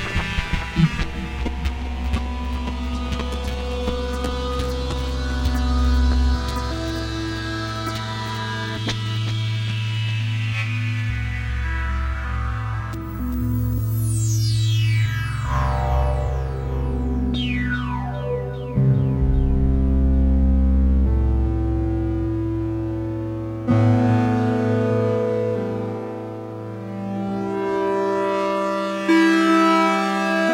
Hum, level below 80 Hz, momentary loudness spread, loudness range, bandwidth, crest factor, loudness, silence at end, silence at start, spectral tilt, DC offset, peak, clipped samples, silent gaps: none; -26 dBFS; 8 LU; 5 LU; 16.5 kHz; 16 dB; -22 LUFS; 0 s; 0 s; -6.5 dB/octave; under 0.1%; -6 dBFS; under 0.1%; none